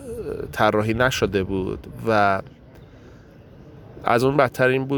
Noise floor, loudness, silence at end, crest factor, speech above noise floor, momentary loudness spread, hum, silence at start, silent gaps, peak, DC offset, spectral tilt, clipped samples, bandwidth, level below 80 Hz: -45 dBFS; -21 LUFS; 0 s; 20 dB; 25 dB; 11 LU; none; 0 s; none; -4 dBFS; under 0.1%; -5.5 dB/octave; under 0.1%; 19 kHz; -44 dBFS